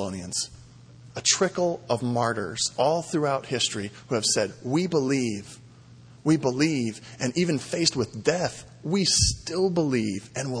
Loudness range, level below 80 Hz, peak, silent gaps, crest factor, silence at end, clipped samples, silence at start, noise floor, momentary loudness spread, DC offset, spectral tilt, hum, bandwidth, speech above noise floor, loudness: 2 LU; -48 dBFS; -8 dBFS; none; 18 dB; 0 s; under 0.1%; 0 s; -49 dBFS; 10 LU; under 0.1%; -4 dB/octave; none; 10.5 kHz; 24 dB; -25 LUFS